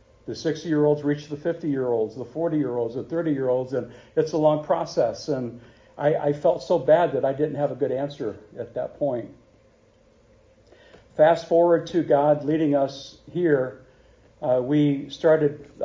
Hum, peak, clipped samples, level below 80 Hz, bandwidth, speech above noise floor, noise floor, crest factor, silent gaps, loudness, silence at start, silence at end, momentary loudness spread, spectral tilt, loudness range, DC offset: none; -6 dBFS; under 0.1%; -60 dBFS; 7.6 kHz; 35 dB; -58 dBFS; 18 dB; none; -24 LUFS; 0.25 s; 0 s; 12 LU; -7.5 dB/octave; 6 LU; under 0.1%